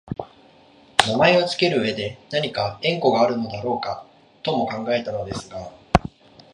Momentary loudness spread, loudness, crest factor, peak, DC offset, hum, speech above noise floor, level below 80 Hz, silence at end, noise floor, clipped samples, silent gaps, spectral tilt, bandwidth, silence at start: 16 LU; -22 LUFS; 22 dB; 0 dBFS; under 0.1%; none; 30 dB; -42 dBFS; 0.45 s; -52 dBFS; under 0.1%; none; -4.5 dB/octave; 12 kHz; 0.05 s